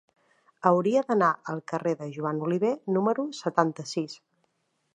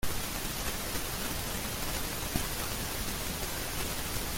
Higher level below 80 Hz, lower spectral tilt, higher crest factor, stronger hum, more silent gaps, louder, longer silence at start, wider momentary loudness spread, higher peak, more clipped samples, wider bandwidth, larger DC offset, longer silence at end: second, -80 dBFS vs -42 dBFS; first, -6.5 dB/octave vs -2.5 dB/octave; about the same, 22 dB vs 20 dB; neither; neither; first, -27 LUFS vs -34 LUFS; first, 0.65 s vs 0 s; first, 9 LU vs 1 LU; first, -6 dBFS vs -14 dBFS; neither; second, 10.5 kHz vs 17 kHz; neither; first, 0.8 s vs 0 s